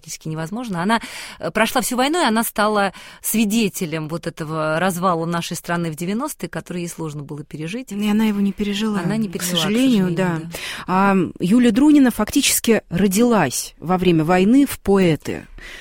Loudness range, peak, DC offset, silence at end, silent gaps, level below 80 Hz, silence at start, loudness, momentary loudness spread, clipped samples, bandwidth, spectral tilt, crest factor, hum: 7 LU; -2 dBFS; under 0.1%; 0 s; none; -46 dBFS; 0.05 s; -19 LUFS; 13 LU; under 0.1%; 16.5 kHz; -4.5 dB/octave; 16 dB; none